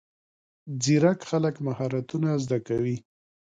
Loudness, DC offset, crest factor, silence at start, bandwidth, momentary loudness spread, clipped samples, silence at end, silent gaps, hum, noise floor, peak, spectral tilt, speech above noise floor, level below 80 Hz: -26 LUFS; under 0.1%; 18 dB; 0.65 s; 9.4 kHz; 9 LU; under 0.1%; 0.6 s; none; none; under -90 dBFS; -8 dBFS; -6 dB/octave; over 65 dB; -62 dBFS